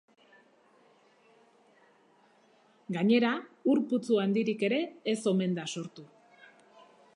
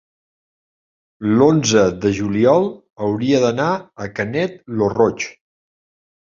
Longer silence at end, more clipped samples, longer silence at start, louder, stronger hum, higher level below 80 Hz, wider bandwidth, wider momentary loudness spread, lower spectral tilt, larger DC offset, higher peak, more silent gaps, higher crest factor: about the same, 1.1 s vs 1 s; neither; first, 2.9 s vs 1.2 s; second, -29 LUFS vs -17 LUFS; neither; second, -84 dBFS vs -50 dBFS; first, 11 kHz vs 7.6 kHz; about the same, 12 LU vs 11 LU; about the same, -6 dB/octave vs -5.5 dB/octave; neither; second, -14 dBFS vs -2 dBFS; second, none vs 2.92-2.96 s; about the same, 18 dB vs 18 dB